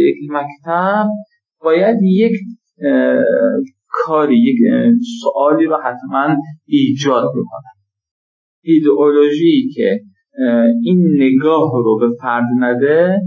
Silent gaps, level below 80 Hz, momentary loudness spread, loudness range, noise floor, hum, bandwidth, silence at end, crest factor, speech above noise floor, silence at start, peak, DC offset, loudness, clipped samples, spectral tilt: 8.11-8.62 s; -72 dBFS; 10 LU; 3 LU; under -90 dBFS; none; 7.4 kHz; 0 s; 12 dB; over 77 dB; 0 s; -2 dBFS; under 0.1%; -14 LUFS; under 0.1%; -7.5 dB/octave